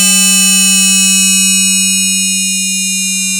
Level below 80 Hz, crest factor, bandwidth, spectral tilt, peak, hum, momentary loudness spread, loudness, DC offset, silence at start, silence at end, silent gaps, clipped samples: -62 dBFS; 6 dB; over 20 kHz; 0 dB/octave; -4 dBFS; none; 6 LU; -7 LUFS; under 0.1%; 0 s; 0 s; none; under 0.1%